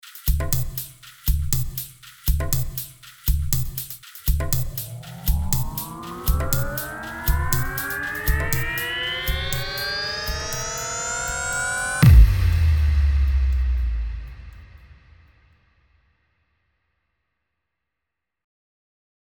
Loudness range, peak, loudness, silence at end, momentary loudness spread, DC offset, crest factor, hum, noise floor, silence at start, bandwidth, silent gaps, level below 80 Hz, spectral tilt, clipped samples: 7 LU; -2 dBFS; -23 LUFS; 4.4 s; 11 LU; under 0.1%; 22 dB; none; -84 dBFS; 0.05 s; over 20 kHz; none; -26 dBFS; -4 dB/octave; under 0.1%